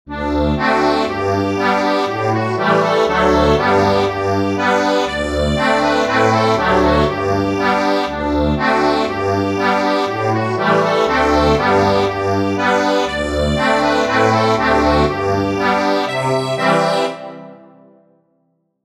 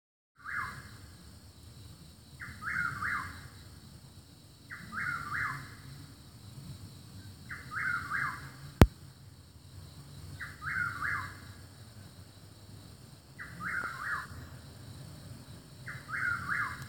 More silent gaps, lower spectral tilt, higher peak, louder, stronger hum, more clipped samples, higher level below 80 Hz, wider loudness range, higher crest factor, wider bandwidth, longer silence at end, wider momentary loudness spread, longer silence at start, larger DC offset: neither; about the same, -5.5 dB/octave vs -5.5 dB/octave; about the same, -2 dBFS vs 0 dBFS; first, -15 LUFS vs -35 LUFS; neither; neither; first, -32 dBFS vs -46 dBFS; second, 1 LU vs 8 LU; second, 14 dB vs 38 dB; second, 14 kHz vs 17 kHz; first, 1.25 s vs 0 s; second, 4 LU vs 20 LU; second, 0.05 s vs 0.4 s; neither